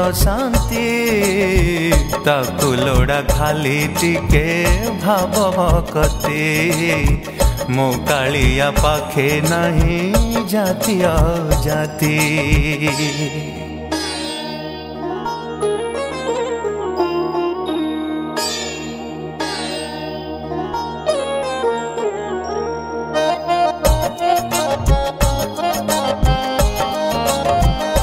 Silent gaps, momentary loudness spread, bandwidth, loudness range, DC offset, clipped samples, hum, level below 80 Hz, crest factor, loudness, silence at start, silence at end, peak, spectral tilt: none; 8 LU; 16.5 kHz; 6 LU; under 0.1%; under 0.1%; none; -24 dBFS; 16 dB; -18 LUFS; 0 s; 0 s; 0 dBFS; -5 dB/octave